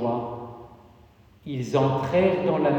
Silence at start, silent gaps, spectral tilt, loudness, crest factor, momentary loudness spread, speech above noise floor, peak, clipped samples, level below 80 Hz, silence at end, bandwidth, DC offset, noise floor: 0 s; none; -7.5 dB/octave; -24 LUFS; 18 dB; 20 LU; 31 dB; -8 dBFS; under 0.1%; -56 dBFS; 0 s; 9 kHz; under 0.1%; -54 dBFS